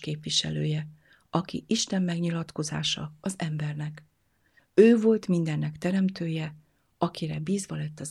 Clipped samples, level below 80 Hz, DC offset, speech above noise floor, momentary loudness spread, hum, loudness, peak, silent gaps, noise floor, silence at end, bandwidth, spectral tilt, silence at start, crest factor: under 0.1%; -64 dBFS; under 0.1%; 39 dB; 13 LU; none; -27 LUFS; -6 dBFS; none; -66 dBFS; 0 s; 12.5 kHz; -5.5 dB/octave; 0 s; 22 dB